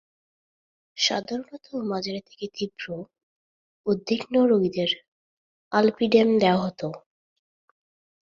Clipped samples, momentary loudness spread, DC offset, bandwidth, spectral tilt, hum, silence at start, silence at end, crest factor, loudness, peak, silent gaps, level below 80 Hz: under 0.1%; 16 LU; under 0.1%; 7.6 kHz; -5 dB/octave; none; 0.95 s; 1.35 s; 20 dB; -24 LUFS; -6 dBFS; 3.23-3.84 s, 5.08-5.71 s; -68 dBFS